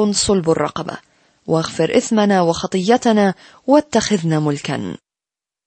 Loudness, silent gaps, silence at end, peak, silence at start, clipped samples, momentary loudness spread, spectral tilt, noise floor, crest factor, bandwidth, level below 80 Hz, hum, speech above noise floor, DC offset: -17 LUFS; none; 0.7 s; -2 dBFS; 0 s; under 0.1%; 14 LU; -5 dB/octave; -89 dBFS; 16 dB; 8.8 kHz; -48 dBFS; none; 72 dB; under 0.1%